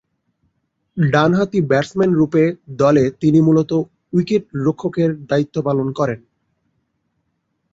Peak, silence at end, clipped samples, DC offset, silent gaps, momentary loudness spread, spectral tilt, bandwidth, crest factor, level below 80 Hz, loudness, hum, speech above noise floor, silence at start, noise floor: -2 dBFS; 1.55 s; under 0.1%; under 0.1%; none; 7 LU; -8 dB/octave; 7.8 kHz; 16 dB; -54 dBFS; -17 LUFS; none; 54 dB; 0.95 s; -70 dBFS